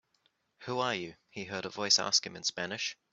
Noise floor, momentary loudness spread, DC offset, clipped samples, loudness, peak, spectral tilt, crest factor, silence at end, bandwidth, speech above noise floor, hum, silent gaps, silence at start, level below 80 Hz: -75 dBFS; 17 LU; under 0.1%; under 0.1%; -31 LUFS; -12 dBFS; -1.5 dB/octave; 22 dB; 0.2 s; 8.2 kHz; 41 dB; none; none; 0.6 s; -76 dBFS